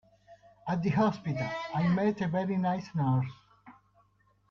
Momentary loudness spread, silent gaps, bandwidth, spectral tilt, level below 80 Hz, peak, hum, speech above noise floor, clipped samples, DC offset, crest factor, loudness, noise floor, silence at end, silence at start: 7 LU; none; 7 kHz; -8.5 dB/octave; -64 dBFS; -14 dBFS; 50 Hz at -50 dBFS; 39 dB; under 0.1%; under 0.1%; 18 dB; -30 LUFS; -68 dBFS; 0.8 s; 0.3 s